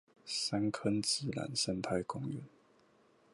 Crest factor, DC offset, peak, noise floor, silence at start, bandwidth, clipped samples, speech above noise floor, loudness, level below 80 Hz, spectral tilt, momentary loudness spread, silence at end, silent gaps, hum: 18 dB; under 0.1%; -20 dBFS; -68 dBFS; 0.25 s; 11.5 kHz; under 0.1%; 32 dB; -36 LUFS; -68 dBFS; -4 dB/octave; 8 LU; 0.85 s; none; none